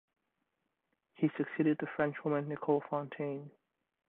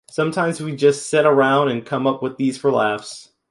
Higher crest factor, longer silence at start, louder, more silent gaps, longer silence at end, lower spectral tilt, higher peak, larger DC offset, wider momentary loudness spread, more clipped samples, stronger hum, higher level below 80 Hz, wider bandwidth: about the same, 20 dB vs 16 dB; first, 1.2 s vs 0.15 s; second, -35 LUFS vs -19 LUFS; neither; first, 0.6 s vs 0.3 s; first, -11 dB/octave vs -5.5 dB/octave; second, -16 dBFS vs -2 dBFS; neither; about the same, 7 LU vs 8 LU; neither; neither; second, -80 dBFS vs -66 dBFS; second, 4 kHz vs 11.5 kHz